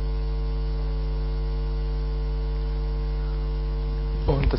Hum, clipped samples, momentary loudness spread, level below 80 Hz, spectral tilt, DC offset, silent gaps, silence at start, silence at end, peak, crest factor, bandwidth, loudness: none; under 0.1%; 2 LU; -26 dBFS; -11 dB/octave; under 0.1%; none; 0 s; 0 s; -10 dBFS; 16 dB; 5.8 kHz; -29 LUFS